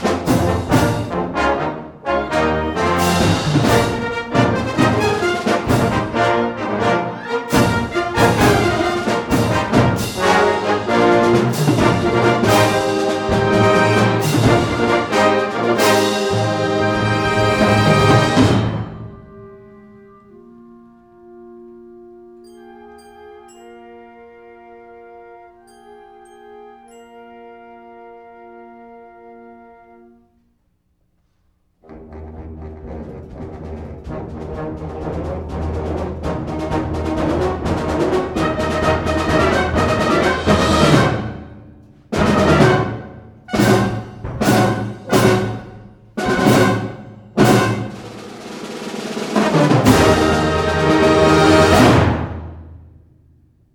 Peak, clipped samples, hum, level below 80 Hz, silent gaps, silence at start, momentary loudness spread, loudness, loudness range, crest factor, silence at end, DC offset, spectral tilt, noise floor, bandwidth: 0 dBFS; under 0.1%; none; -36 dBFS; none; 0 s; 17 LU; -16 LUFS; 11 LU; 18 dB; 0.95 s; under 0.1%; -5.5 dB/octave; -63 dBFS; 19.5 kHz